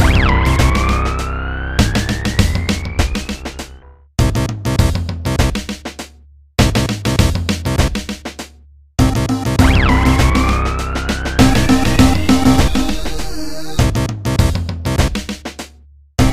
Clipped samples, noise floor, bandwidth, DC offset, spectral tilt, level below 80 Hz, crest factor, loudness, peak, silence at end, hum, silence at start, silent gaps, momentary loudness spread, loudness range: under 0.1%; -44 dBFS; 15.5 kHz; under 0.1%; -5.5 dB/octave; -20 dBFS; 14 dB; -16 LUFS; 0 dBFS; 0 s; none; 0 s; none; 14 LU; 6 LU